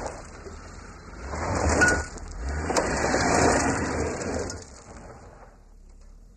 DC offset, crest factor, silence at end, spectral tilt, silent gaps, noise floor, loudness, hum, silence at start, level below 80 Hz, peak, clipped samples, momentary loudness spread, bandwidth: under 0.1%; 18 dB; 0.05 s; -4 dB/octave; none; -49 dBFS; -25 LUFS; none; 0 s; -38 dBFS; -8 dBFS; under 0.1%; 23 LU; 13.5 kHz